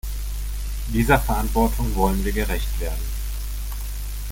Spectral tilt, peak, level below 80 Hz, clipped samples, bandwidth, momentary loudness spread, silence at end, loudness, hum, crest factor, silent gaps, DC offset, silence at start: -5.5 dB/octave; -2 dBFS; -26 dBFS; under 0.1%; 17 kHz; 12 LU; 0 s; -24 LUFS; 50 Hz at -25 dBFS; 20 dB; none; under 0.1%; 0.05 s